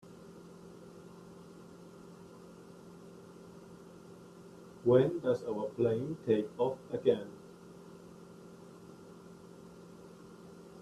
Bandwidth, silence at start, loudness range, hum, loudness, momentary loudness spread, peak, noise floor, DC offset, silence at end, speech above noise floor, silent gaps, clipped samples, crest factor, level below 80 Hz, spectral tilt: 13 kHz; 0.05 s; 21 LU; none; -32 LUFS; 22 LU; -14 dBFS; -53 dBFS; under 0.1%; 0 s; 22 dB; none; under 0.1%; 24 dB; -72 dBFS; -8 dB/octave